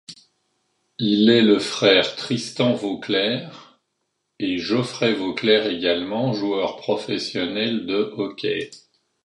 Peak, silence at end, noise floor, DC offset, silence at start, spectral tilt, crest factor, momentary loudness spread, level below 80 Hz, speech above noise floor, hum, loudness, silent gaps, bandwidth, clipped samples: -2 dBFS; 0.45 s; -75 dBFS; under 0.1%; 0.1 s; -5 dB/octave; 20 dB; 10 LU; -62 dBFS; 54 dB; none; -21 LUFS; none; 11.5 kHz; under 0.1%